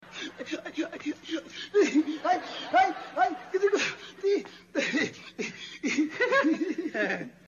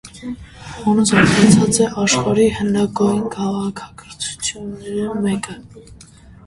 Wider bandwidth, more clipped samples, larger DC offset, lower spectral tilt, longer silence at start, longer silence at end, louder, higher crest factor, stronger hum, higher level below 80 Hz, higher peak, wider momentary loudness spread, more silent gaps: second, 7.4 kHz vs 11.5 kHz; neither; neither; about the same, -3.5 dB/octave vs -4.5 dB/octave; about the same, 0 s vs 0.05 s; second, 0.15 s vs 0.55 s; second, -29 LUFS vs -17 LUFS; about the same, 18 dB vs 18 dB; neither; second, -74 dBFS vs -44 dBFS; second, -12 dBFS vs 0 dBFS; second, 12 LU vs 20 LU; neither